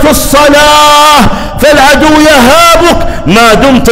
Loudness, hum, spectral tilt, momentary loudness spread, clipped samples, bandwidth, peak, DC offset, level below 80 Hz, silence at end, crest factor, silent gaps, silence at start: -3 LUFS; none; -3.5 dB/octave; 6 LU; 3%; over 20 kHz; 0 dBFS; under 0.1%; -18 dBFS; 0 s; 4 dB; none; 0 s